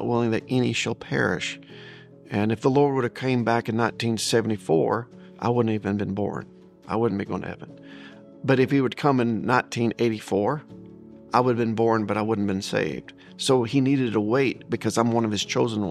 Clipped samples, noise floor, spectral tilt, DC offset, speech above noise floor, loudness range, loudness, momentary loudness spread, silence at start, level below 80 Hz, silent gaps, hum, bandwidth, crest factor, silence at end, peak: under 0.1%; -45 dBFS; -5.5 dB/octave; under 0.1%; 21 dB; 3 LU; -24 LUFS; 15 LU; 0 s; -62 dBFS; none; none; 14 kHz; 20 dB; 0 s; -4 dBFS